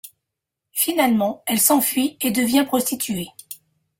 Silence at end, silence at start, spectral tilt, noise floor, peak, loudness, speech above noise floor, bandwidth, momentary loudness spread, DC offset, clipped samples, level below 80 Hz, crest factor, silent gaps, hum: 0.45 s; 0.05 s; -3 dB/octave; -83 dBFS; -4 dBFS; -19 LUFS; 63 dB; 17 kHz; 17 LU; under 0.1%; under 0.1%; -62 dBFS; 18 dB; none; none